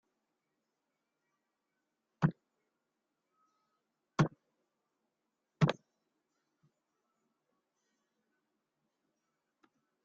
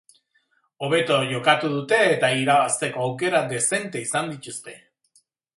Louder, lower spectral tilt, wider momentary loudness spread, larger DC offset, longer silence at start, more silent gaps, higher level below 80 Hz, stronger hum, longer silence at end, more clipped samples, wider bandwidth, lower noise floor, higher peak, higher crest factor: second, -35 LUFS vs -21 LUFS; first, -6.5 dB/octave vs -3.5 dB/octave; second, 7 LU vs 13 LU; neither; first, 2.2 s vs 0.8 s; neither; about the same, -70 dBFS vs -70 dBFS; neither; first, 4.35 s vs 0.8 s; neither; second, 7.2 kHz vs 11.5 kHz; first, -86 dBFS vs -67 dBFS; second, -16 dBFS vs -4 dBFS; first, 28 dB vs 20 dB